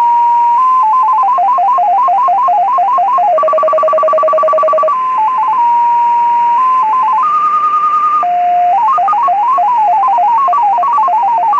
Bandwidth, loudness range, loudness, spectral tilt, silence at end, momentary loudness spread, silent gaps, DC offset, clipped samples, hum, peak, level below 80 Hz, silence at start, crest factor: 7.8 kHz; 1 LU; -10 LUFS; -4 dB/octave; 0 s; 2 LU; none; under 0.1%; under 0.1%; none; -4 dBFS; -64 dBFS; 0 s; 6 dB